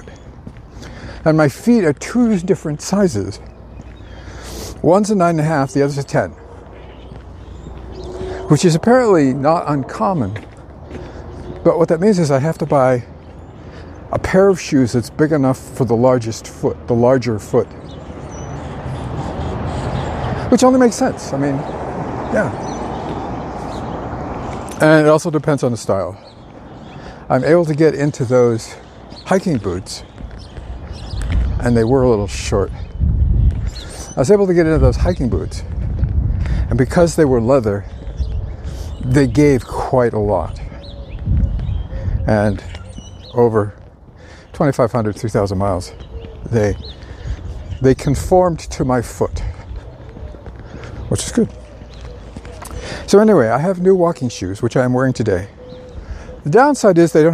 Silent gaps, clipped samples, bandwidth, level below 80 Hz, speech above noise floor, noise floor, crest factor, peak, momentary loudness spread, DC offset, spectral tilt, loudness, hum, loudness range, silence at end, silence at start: none; under 0.1%; 15 kHz; -28 dBFS; 25 dB; -39 dBFS; 16 dB; 0 dBFS; 22 LU; under 0.1%; -6.5 dB/octave; -16 LUFS; none; 4 LU; 0 s; 0 s